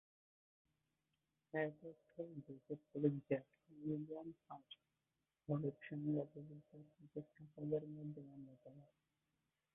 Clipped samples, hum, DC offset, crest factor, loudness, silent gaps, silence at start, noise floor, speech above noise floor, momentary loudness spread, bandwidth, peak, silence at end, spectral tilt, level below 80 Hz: under 0.1%; none; under 0.1%; 24 dB; -47 LUFS; none; 1.55 s; under -90 dBFS; over 43 dB; 19 LU; 3.8 kHz; -24 dBFS; 0.9 s; -6.5 dB/octave; -86 dBFS